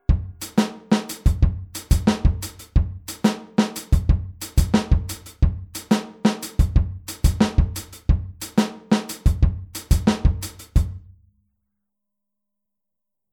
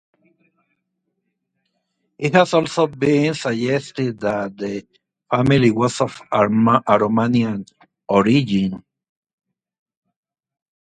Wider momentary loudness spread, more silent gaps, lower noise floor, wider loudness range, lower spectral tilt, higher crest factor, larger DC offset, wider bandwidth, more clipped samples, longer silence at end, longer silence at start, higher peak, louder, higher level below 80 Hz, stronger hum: second, 6 LU vs 10 LU; neither; first, -85 dBFS vs -75 dBFS; about the same, 3 LU vs 4 LU; about the same, -6 dB/octave vs -6.5 dB/octave; about the same, 18 dB vs 20 dB; neither; first, 19 kHz vs 9.4 kHz; neither; first, 2.35 s vs 2.05 s; second, 0.1 s vs 2.2 s; second, -4 dBFS vs 0 dBFS; second, -23 LUFS vs -18 LUFS; first, -24 dBFS vs -54 dBFS; neither